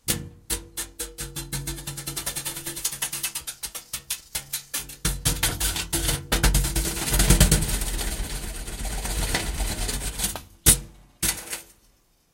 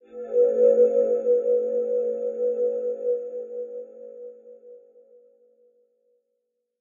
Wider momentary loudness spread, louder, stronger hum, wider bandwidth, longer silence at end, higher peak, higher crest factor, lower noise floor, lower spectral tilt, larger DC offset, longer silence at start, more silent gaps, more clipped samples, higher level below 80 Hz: second, 13 LU vs 22 LU; about the same, -25 LUFS vs -23 LUFS; neither; first, 17 kHz vs 1.9 kHz; second, 0.7 s vs 2.05 s; first, 0 dBFS vs -8 dBFS; first, 26 dB vs 16 dB; second, -62 dBFS vs -78 dBFS; second, -2.5 dB/octave vs -8 dB/octave; neither; about the same, 0.05 s vs 0.1 s; neither; neither; first, -30 dBFS vs -86 dBFS